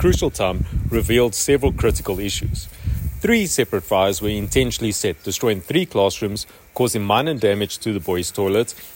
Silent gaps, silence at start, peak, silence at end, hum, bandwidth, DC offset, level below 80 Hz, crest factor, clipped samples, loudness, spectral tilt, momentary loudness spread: none; 0 s; -4 dBFS; 0 s; none; 16.5 kHz; under 0.1%; -32 dBFS; 16 dB; under 0.1%; -20 LUFS; -4.5 dB/octave; 7 LU